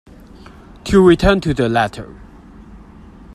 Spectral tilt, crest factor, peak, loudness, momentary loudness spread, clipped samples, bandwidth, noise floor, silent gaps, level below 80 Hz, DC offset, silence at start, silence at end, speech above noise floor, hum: -6.5 dB/octave; 18 dB; 0 dBFS; -14 LUFS; 22 LU; under 0.1%; 12.5 kHz; -40 dBFS; none; -32 dBFS; under 0.1%; 0.85 s; 0.55 s; 26 dB; none